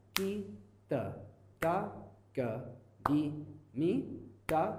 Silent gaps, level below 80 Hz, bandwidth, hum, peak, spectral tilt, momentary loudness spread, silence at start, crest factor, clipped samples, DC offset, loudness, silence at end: none; -64 dBFS; 15.5 kHz; none; -6 dBFS; -6 dB/octave; 17 LU; 0.15 s; 30 dB; under 0.1%; under 0.1%; -37 LUFS; 0 s